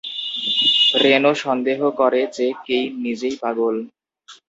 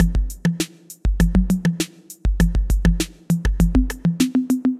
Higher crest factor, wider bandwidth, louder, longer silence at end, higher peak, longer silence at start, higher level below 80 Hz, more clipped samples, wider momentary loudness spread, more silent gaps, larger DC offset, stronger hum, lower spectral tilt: first, 20 dB vs 14 dB; second, 8 kHz vs 14.5 kHz; first, -18 LUFS vs -21 LUFS; first, 0.15 s vs 0 s; first, 0 dBFS vs -4 dBFS; about the same, 0.05 s vs 0 s; second, -68 dBFS vs -22 dBFS; neither; first, 11 LU vs 8 LU; neither; neither; neither; second, -3.5 dB/octave vs -6 dB/octave